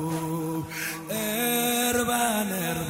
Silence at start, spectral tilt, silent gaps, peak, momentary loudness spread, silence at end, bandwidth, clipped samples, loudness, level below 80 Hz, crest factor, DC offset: 0 s; -3.5 dB/octave; none; -10 dBFS; 8 LU; 0 s; 16.5 kHz; under 0.1%; -26 LUFS; -56 dBFS; 16 dB; under 0.1%